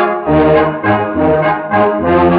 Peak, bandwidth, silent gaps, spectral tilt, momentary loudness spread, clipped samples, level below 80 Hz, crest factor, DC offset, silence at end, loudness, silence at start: 0 dBFS; 5 kHz; none; -6 dB/octave; 3 LU; under 0.1%; -36 dBFS; 10 dB; under 0.1%; 0 s; -12 LUFS; 0 s